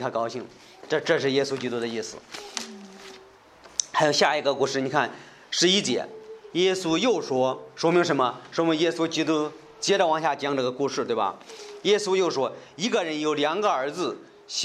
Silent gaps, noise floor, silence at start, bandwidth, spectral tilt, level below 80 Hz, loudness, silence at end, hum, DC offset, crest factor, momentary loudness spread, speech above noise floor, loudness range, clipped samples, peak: none; -51 dBFS; 0 s; 13 kHz; -3.5 dB/octave; -72 dBFS; -25 LUFS; 0 s; none; under 0.1%; 22 dB; 15 LU; 26 dB; 4 LU; under 0.1%; -4 dBFS